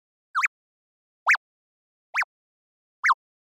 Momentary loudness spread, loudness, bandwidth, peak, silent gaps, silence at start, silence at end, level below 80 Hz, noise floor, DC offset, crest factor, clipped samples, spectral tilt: 8 LU; -25 LUFS; 16 kHz; -12 dBFS; 0.48-1.26 s, 1.37-2.13 s, 2.24-3.03 s; 0.35 s; 0.3 s; under -90 dBFS; under -90 dBFS; under 0.1%; 18 dB; under 0.1%; 5.5 dB/octave